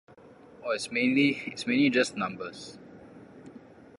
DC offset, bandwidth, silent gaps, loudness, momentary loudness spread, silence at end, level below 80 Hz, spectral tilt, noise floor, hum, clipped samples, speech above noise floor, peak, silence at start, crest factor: under 0.1%; 11 kHz; none; -27 LUFS; 25 LU; 0.4 s; -70 dBFS; -4.5 dB/octave; -53 dBFS; none; under 0.1%; 25 dB; -12 dBFS; 0.5 s; 18 dB